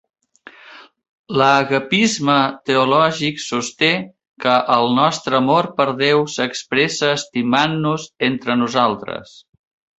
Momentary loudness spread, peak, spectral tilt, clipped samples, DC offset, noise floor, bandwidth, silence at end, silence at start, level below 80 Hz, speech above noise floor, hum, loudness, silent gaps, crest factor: 8 LU; -2 dBFS; -4 dB/octave; under 0.1%; under 0.1%; -45 dBFS; 8.2 kHz; 0.75 s; 0.65 s; -60 dBFS; 27 dB; none; -17 LUFS; 1.09-1.24 s, 4.27-4.32 s; 18 dB